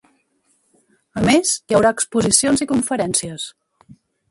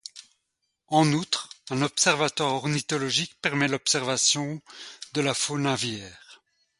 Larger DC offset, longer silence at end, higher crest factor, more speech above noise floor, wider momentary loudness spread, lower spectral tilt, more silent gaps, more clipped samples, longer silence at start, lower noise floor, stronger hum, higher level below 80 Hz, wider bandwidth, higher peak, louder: neither; first, 0.8 s vs 0.45 s; about the same, 20 dB vs 20 dB; second, 46 dB vs 53 dB; about the same, 15 LU vs 14 LU; about the same, -3.5 dB/octave vs -3 dB/octave; neither; neither; first, 1.15 s vs 0.15 s; second, -64 dBFS vs -79 dBFS; neither; first, -48 dBFS vs -66 dBFS; about the same, 12 kHz vs 11.5 kHz; first, 0 dBFS vs -6 dBFS; first, -17 LUFS vs -25 LUFS